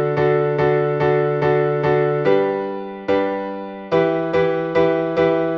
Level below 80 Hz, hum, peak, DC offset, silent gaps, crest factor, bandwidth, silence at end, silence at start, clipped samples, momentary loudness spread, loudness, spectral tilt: -52 dBFS; none; -4 dBFS; under 0.1%; none; 14 dB; 6.2 kHz; 0 s; 0 s; under 0.1%; 7 LU; -19 LUFS; -8.5 dB/octave